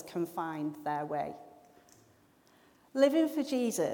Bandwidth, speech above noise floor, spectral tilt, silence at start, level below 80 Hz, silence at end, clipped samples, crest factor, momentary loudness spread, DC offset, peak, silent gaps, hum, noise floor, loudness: 20 kHz; 33 dB; -5 dB/octave; 0 s; -78 dBFS; 0 s; under 0.1%; 20 dB; 12 LU; under 0.1%; -14 dBFS; none; none; -64 dBFS; -32 LUFS